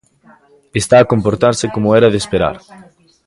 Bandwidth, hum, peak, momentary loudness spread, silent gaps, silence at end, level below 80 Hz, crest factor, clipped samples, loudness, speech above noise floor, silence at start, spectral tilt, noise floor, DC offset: 11.5 kHz; none; 0 dBFS; 10 LU; none; 0.45 s; -42 dBFS; 14 dB; under 0.1%; -13 LUFS; 35 dB; 0.75 s; -5.5 dB/octave; -48 dBFS; under 0.1%